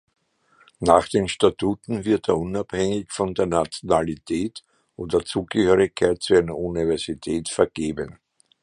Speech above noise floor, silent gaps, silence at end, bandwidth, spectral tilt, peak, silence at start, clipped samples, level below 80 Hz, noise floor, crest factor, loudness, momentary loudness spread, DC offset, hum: 38 dB; none; 0.5 s; 11.5 kHz; -5.5 dB/octave; -2 dBFS; 0.8 s; under 0.1%; -46 dBFS; -60 dBFS; 22 dB; -22 LUFS; 9 LU; under 0.1%; none